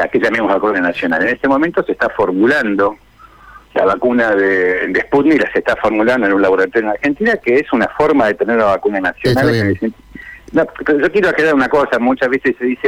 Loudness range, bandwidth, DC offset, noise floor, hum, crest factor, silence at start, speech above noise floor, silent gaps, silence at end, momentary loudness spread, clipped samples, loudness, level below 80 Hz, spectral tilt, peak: 2 LU; 16.5 kHz; under 0.1%; -41 dBFS; none; 10 dB; 0 s; 28 dB; none; 0 s; 5 LU; under 0.1%; -14 LUFS; -44 dBFS; -6.5 dB/octave; -4 dBFS